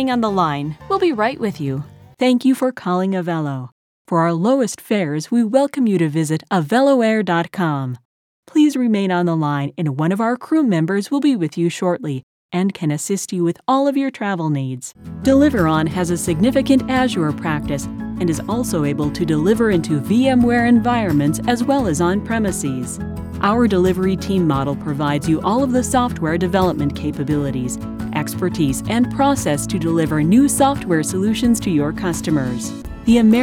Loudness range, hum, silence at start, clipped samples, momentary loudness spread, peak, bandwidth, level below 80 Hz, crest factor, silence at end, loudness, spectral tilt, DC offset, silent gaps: 3 LU; none; 0 s; under 0.1%; 9 LU; -2 dBFS; 16.5 kHz; -40 dBFS; 16 dB; 0 s; -18 LUFS; -6 dB/octave; under 0.1%; 3.72-4.05 s, 8.05-8.43 s, 12.23-12.49 s